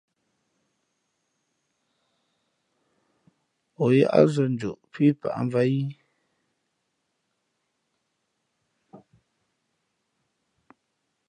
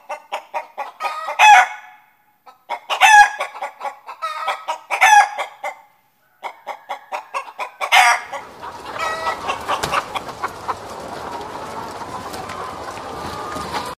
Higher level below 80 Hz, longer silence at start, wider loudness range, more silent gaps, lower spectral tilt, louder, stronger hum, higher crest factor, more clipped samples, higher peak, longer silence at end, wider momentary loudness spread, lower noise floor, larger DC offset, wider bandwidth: second, -70 dBFS vs -54 dBFS; first, 3.8 s vs 0.1 s; second, 8 LU vs 12 LU; neither; first, -8 dB/octave vs -0.5 dB/octave; second, -23 LUFS vs -16 LUFS; neither; first, 26 dB vs 20 dB; neither; second, -4 dBFS vs 0 dBFS; first, 2.3 s vs 0.05 s; second, 11 LU vs 21 LU; first, -77 dBFS vs -59 dBFS; neither; second, 10 kHz vs 15.5 kHz